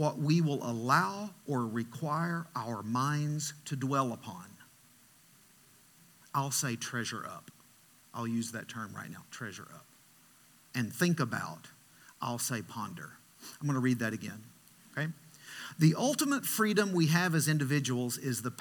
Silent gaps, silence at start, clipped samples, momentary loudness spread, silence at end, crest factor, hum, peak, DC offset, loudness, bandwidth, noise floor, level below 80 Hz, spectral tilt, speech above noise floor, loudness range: none; 0 s; under 0.1%; 17 LU; 0 s; 22 dB; none; -12 dBFS; under 0.1%; -33 LUFS; 19 kHz; -62 dBFS; -80 dBFS; -5 dB/octave; 29 dB; 9 LU